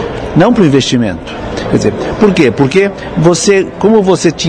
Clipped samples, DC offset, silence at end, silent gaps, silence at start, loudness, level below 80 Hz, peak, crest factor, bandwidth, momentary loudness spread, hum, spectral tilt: 1%; under 0.1%; 0 s; none; 0 s; -10 LUFS; -32 dBFS; 0 dBFS; 10 dB; 10.5 kHz; 7 LU; none; -5.5 dB/octave